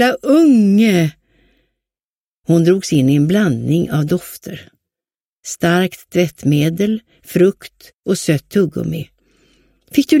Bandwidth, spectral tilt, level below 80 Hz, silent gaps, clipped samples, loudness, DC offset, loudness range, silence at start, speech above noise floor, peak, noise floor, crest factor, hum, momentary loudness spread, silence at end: 16.5 kHz; -6.5 dB/octave; -52 dBFS; 2.05-2.43 s, 5.24-5.41 s, 7.94-8.03 s; under 0.1%; -15 LUFS; under 0.1%; 4 LU; 0 s; over 76 dB; 0 dBFS; under -90 dBFS; 16 dB; none; 18 LU; 0 s